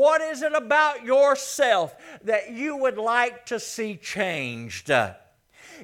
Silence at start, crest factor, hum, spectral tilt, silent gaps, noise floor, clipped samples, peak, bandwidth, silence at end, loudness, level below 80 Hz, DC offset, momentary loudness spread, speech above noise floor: 0 s; 18 dB; none; -3 dB/octave; none; -52 dBFS; under 0.1%; -6 dBFS; 16.5 kHz; 0 s; -24 LUFS; -70 dBFS; under 0.1%; 11 LU; 29 dB